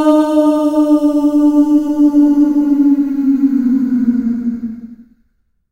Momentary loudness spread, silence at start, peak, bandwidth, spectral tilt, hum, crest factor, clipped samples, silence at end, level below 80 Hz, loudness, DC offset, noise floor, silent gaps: 8 LU; 0 s; 0 dBFS; 9.6 kHz; -7 dB/octave; none; 12 dB; under 0.1%; 0.7 s; -48 dBFS; -12 LUFS; under 0.1%; -60 dBFS; none